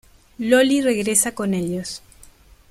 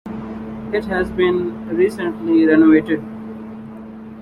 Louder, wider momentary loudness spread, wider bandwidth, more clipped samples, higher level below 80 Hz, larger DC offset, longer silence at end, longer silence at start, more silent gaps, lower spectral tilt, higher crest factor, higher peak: about the same, -19 LUFS vs -17 LUFS; second, 14 LU vs 21 LU; first, 15.5 kHz vs 10.5 kHz; neither; second, -52 dBFS vs -46 dBFS; neither; first, 0.75 s vs 0 s; first, 0.4 s vs 0.05 s; neither; second, -3.5 dB/octave vs -7.5 dB/octave; about the same, 18 dB vs 16 dB; about the same, -4 dBFS vs -2 dBFS